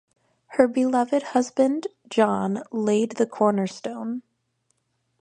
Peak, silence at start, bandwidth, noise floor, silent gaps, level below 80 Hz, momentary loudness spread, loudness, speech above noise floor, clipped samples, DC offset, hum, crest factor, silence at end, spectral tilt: -2 dBFS; 0.5 s; 9.8 kHz; -72 dBFS; none; -70 dBFS; 9 LU; -24 LUFS; 50 dB; under 0.1%; under 0.1%; none; 22 dB; 1 s; -6 dB/octave